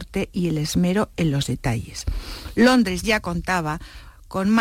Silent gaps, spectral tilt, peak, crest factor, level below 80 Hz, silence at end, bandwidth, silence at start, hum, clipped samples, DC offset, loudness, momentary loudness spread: none; -5.5 dB/octave; -8 dBFS; 14 dB; -36 dBFS; 0 s; 16.5 kHz; 0 s; none; under 0.1%; under 0.1%; -22 LUFS; 14 LU